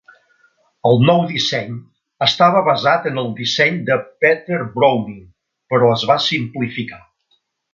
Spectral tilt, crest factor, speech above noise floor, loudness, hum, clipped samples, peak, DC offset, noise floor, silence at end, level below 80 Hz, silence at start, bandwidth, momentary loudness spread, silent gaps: -5.5 dB/octave; 18 dB; 48 dB; -16 LUFS; none; under 0.1%; 0 dBFS; under 0.1%; -64 dBFS; 0.75 s; -58 dBFS; 0.85 s; 7.4 kHz; 11 LU; none